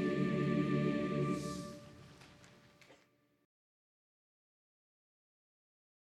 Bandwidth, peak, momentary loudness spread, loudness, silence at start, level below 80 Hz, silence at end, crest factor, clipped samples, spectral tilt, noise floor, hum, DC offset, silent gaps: 13 kHz; -22 dBFS; 23 LU; -36 LUFS; 0 s; -68 dBFS; 3.2 s; 18 dB; under 0.1%; -7 dB/octave; -72 dBFS; none; under 0.1%; none